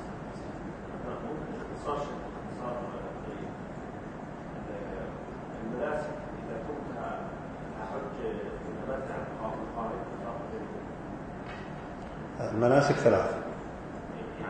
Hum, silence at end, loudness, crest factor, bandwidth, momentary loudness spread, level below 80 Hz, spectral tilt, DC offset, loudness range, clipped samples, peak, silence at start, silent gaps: none; 0 s; -35 LUFS; 26 dB; 9 kHz; 12 LU; -52 dBFS; -7 dB/octave; under 0.1%; 9 LU; under 0.1%; -8 dBFS; 0 s; none